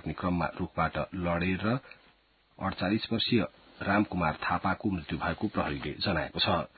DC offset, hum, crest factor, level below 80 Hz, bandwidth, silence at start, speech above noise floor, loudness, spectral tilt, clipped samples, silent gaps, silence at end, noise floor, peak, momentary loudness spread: under 0.1%; none; 18 dB; -48 dBFS; 4.8 kHz; 0.05 s; 35 dB; -31 LUFS; -10 dB/octave; under 0.1%; none; 0.1 s; -65 dBFS; -12 dBFS; 5 LU